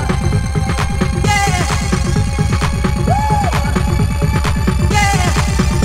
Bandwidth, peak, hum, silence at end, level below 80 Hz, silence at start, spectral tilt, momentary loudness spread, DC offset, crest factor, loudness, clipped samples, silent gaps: 16 kHz; 0 dBFS; none; 0 s; -20 dBFS; 0 s; -5 dB/octave; 3 LU; under 0.1%; 14 dB; -15 LUFS; under 0.1%; none